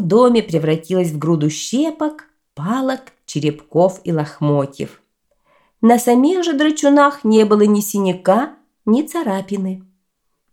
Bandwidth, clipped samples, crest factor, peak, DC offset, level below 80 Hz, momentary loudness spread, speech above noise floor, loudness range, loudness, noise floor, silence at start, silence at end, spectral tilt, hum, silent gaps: 17 kHz; under 0.1%; 16 dB; 0 dBFS; under 0.1%; -62 dBFS; 13 LU; 56 dB; 6 LU; -16 LUFS; -71 dBFS; 0 s; 0.7 s; -6 dB/octave; none; none